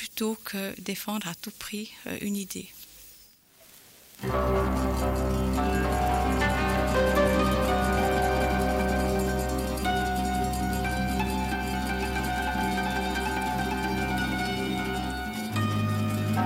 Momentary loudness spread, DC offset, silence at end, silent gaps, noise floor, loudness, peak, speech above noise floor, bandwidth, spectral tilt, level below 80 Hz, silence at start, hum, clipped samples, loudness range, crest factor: 9 LU; under 0.1%; 0 s; none; -56 dBFS; -28 LUFS; -12 dBFS; 26 dB; 16.5 kHz; -5.5 dB/octave; -36 dBFS; 0 s; none; under 0.1%; 9 LU; 16 dB